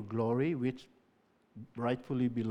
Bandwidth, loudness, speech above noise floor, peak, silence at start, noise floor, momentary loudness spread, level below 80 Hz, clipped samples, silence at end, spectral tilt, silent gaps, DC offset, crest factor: 8.6 kHz; -34 LUFS; 37 dB; -20 dBFS; 0 s; -71 dBFS; 18 LU; -70 dBFS; under 0.1%; 0 s; -9 dB/octave; none; under 0.1%; 16 dB